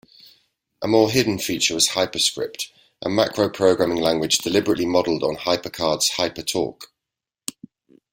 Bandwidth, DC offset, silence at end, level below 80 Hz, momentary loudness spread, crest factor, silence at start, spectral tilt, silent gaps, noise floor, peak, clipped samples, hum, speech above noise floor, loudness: 17 kHz; under 0.1%; 1.25 s; -56 dBFS; 13 LU; 20 dB; 0.8 s; -3 dB/octave; none; -86 dBFS; -2 dBFS; under 0.1%; none; 66 dB; -20 LUFS